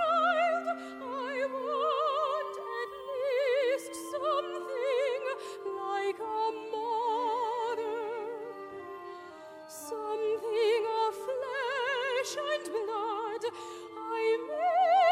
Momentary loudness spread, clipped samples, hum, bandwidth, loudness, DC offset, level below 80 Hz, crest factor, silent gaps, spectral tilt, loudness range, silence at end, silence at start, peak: 13 LU; under 0.1%; none; 16 kHz; -32 LUFS; under 0.1%; -80 dBFS; 16 dB; none; -2 dB/octave; 3 LU; 0 s; 0 s; -16 dBFS